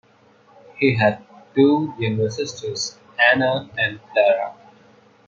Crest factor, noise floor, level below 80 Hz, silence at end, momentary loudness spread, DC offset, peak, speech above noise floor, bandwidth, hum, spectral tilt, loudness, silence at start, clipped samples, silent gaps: 20 dB; -54 dBFS; -64 dBFS; 0.75 s; 11 LU; under 0.1%; -2 dBFS; 35 dB; 7.6 kHz; none; -5 dB/octave; -20 LUFS; 0.75 s; under 0.1%; none